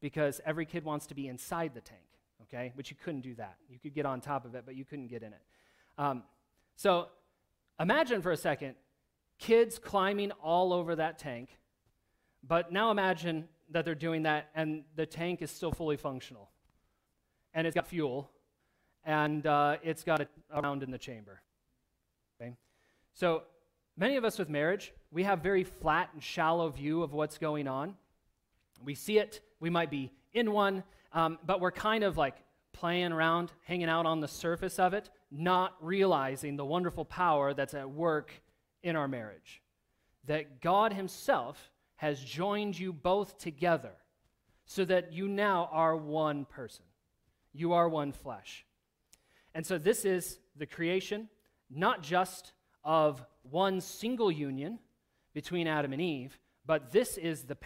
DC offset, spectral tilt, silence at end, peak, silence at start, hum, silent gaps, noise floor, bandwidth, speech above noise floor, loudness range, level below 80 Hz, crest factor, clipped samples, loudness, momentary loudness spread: under 0.1%; -5.5 dB/octave; 0 s; -14 dBFS; 0 s; none; none; -81 dBFS; 16 kHz; 48 dB; 7 LU; -64 dBFS; 20 dB; under 0.1%; -33 LUFS; 16 LU